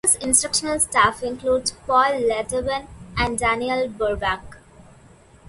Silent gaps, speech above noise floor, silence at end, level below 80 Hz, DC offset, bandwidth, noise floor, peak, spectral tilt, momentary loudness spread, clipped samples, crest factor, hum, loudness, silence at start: none; 28 dB; 0.9 s; -42 dBFS; under 0.1%; 12 kHz; -50 dBFS; -2 dBFS; -2 dB/octave; 9 LU; under 0.1%; 20 dB; none; -21 LUFS; 0.05 s